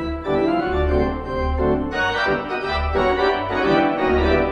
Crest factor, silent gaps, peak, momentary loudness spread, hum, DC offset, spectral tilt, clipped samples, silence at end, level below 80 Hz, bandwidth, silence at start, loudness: 14 dB; none; -6 dBFS; 5 LU; none; under 0.1%; -7 dB/octave; under 0.1%; 0 s; -28 dBFS; 8.4 kHz; 0 s; -20 LUFS